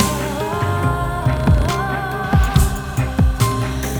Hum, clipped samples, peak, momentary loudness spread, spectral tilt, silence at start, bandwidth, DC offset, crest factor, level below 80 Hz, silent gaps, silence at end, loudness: none; under 0.1%; 0 dBFS; 5 LU; -5.5 dB/octave; 0 s; over 20 kHz; under 0.1%; 16 dB; -22 dBFS; none; 0 s; -18 LUFS